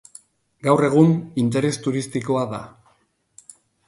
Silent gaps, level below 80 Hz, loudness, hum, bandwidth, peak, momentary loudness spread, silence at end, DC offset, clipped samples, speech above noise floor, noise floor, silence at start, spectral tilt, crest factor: none; -60 dBFS; -20 LUFS; none; 11.5 kHz; -2 dBFS; 11 LU; 1.2 s; under 0.1%; under 0.1%; 44 dB; -64 dBFS; 0.65 s; -7 dB/octave; 20 dB